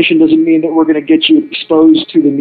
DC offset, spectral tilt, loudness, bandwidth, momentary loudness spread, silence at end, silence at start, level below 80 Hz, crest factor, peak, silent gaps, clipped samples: under 0.1%; -9 dB/octave; -9 LUFS; 4.7 kHz; 4 LU; 0 s; 0 s; -54 dBFS; 8 dB; 0 dBFS; none; under 0.1%